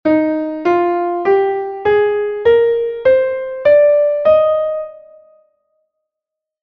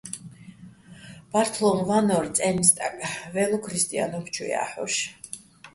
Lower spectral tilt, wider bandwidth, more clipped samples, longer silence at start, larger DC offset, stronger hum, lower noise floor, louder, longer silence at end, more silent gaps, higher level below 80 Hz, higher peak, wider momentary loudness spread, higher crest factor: first, -7.5 dB/octave vs -3.5 dB/octave; second, 5.4 kHz vs 12 kHz; neither; about the same, 0.05 s vs 0.05 s; neither; neither; first, -83 dBFS vs -47 dBFS; first, -14 LUFS vs -24 LUFS; first, 1.65 s vs 0.05 s; neither; first, -52 dBFS vs -60 dBFS; about the same, -2 dBFS vs -2 dBFS; second, 7 LU vs 19 LU; second, 12 dB vs 24 dB